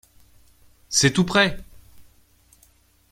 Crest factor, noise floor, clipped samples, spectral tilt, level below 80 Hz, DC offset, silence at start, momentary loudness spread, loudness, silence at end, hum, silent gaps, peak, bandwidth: 22 dB; -58 dBFS; under 0.1%; -3.5 dB/octave; -48 dBFS; under 0.1%; 0.9 s; 7 LU; -19 LUFS; 1.1 s; none; none; -4 dBFS; 16 kHz